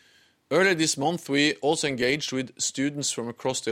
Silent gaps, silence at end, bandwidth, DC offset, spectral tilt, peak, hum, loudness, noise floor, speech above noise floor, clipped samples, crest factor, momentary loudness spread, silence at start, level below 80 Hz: none; 0 s; 16.5 kHz; under 0.1%; -3 dB/octave; -8 dBFS; none; -25 LUFS; -61 dBFS; 35 dB; under 0.1%; 18 dB; 7 LU; 0.5 s; -66 dBFS